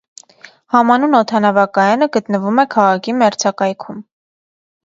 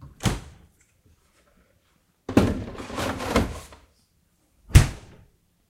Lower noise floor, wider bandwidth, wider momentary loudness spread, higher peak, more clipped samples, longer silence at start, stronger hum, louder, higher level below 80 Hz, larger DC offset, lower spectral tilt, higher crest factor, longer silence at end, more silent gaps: second, -43 dBFS vs -66 dBFS; second, 7.8 kHz vs 16 kHz; second, 8 LU vs 19 LU; about the same, 0 dBFS vs 0 dBFS; neither; first, 0.7 s vs 0 s; neither; first, -14 LUFS vs -24 LUFS; second, -66 dBFS vs -34 dBFS; neither; about the same, -5 dB/octave vs -5.5 dB/octave; second, 16 dB vs 26 dB; first, 0.85 s vs 0.7 s; neither